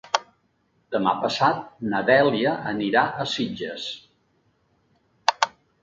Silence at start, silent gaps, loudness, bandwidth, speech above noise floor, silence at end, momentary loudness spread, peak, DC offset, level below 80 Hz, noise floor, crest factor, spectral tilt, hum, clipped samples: 0.05 s; none; -23 LUFS; 7.8 kHz; 44 dB; 0.35 s; 12 LU; 0 dBFS; under 0.1%; -64 dBFS; -67 dBFS; 24 dB; -4.5 dB/octave; none; under 0.1%